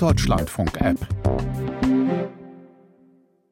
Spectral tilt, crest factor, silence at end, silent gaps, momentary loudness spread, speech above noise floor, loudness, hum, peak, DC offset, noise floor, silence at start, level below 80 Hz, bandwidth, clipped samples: -6.5 dB/octave; 18 dB; 0.85 s; none; 11 LU; 36 dB; -23 LUFS; none; -6 dBFS; under 0.1%; -57 dBFS; 0 s; -34 dBFS; 16.5 kHz; under 0.1%